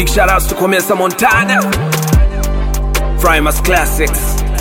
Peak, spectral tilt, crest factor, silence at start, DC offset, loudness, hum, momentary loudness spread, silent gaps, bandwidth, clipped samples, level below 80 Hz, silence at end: 0 dBFS; -4.5 dB/octave; 12 dB; 0 s; under 0.1%; -12 LUFS; none; 6 LU; none; 17 kHz; under 0.1%; -16 dBFS; 0 s